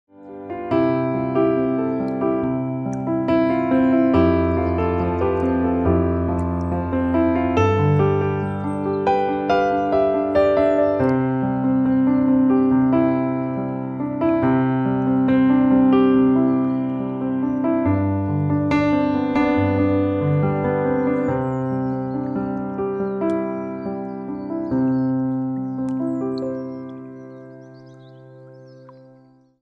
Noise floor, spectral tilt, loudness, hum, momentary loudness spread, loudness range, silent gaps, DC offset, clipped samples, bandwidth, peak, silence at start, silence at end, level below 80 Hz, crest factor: -52 dBFS; -9.5 dB/octave; -20 LUFS; none; 9 LU; 7 LU; none; under 0.1%; under 0.1%; 6.2 kHz; -4 dBFS; 0.2 s; 0.7 s; -44 dBFS; 14 dB